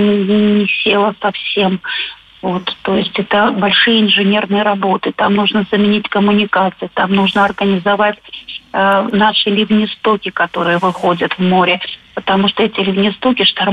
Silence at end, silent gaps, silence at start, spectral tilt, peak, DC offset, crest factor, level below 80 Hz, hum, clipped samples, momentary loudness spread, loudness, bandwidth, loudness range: 0 s; none; 0 s; -7 dB/octave; -2 dBFS; under 0.1%; 12 dB; -52 dBFS; none; under 0.1%; 7 LU; -13 LUFS; 5.2 kHz; 2 LU